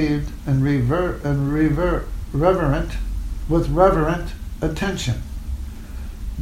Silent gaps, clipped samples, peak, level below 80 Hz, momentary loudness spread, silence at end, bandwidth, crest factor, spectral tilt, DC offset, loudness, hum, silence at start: none; under 0.1%; -2 dBFS; -28 dBFS; 16 LU; 0 s; 16 kHz; 18 dB; -7 dB/octave; under 0.1%; -21 LUFS; none; 0 s